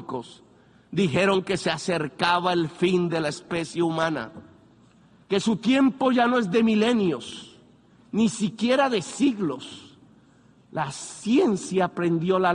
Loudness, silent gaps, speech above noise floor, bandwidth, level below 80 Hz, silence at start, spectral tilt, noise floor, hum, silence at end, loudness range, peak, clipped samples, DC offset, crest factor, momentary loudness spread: -24 LUFS; none; 33 dB; 10.5 kHz; -64 dBFS; 0 s; -5.5 dB/octave; -56 dBFS; none; 0 s; 3 LU; -6 dBFS; under 0.1%; under 0.1%; 18 dB; 12 LU